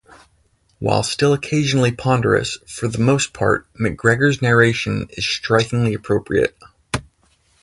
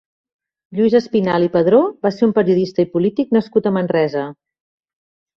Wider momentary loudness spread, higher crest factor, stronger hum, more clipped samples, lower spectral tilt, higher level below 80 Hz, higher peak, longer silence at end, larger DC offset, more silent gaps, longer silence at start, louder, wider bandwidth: first, 10 LU vs 6 LU; about the same, 18 dB vs 16 dB; neither; neither; second, -5 dB/octave vs -8.5 dB/octave; first, -44 dBFS vs -58 dBFS; about the same, 0 dBFS vs -2 dBFS; second, 0.6 s vs 1.1 s; neither; neither; about the same, 0.8 s vs 0.7 s; about the same, -18 LUFS vs -16 LUFS; first, 11.5 kHz vs 6.8 kHz